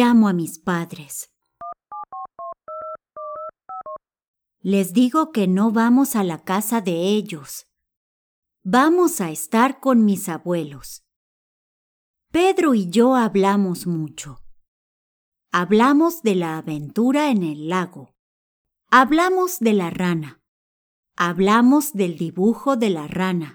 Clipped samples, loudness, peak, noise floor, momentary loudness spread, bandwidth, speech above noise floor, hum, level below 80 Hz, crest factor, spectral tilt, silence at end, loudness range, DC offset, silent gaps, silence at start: under 0.1%; -19 LUFS; 0 dBFS; under -90 dBFS; 19 LU; over 20 kHz; over 71 dB; none; -58 dBFS; 20 dB; -5.5 dB/octave; 0.05 s; 5 LU; under 0.1%; 4.28-4.34 s, 7.97-8.43 s, 11.16-12.14 s, 14.68-15.32 s, 18.19-18.65 s, 20.48-21.03 s; 0 s